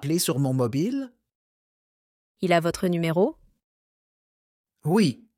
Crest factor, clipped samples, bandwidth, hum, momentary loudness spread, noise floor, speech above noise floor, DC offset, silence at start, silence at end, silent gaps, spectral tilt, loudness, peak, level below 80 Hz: 20 dB; under 0.1%; 17 kHz; none; 9 LU; under -90 dBFS; over 67 dB; under 0.1%; 0 s; 0.25 s; 1.35-2.35 s, 3.64-4.64 s; -5.5 dB/octave; -25 LUFS; -6 dBFS; -62 dBFS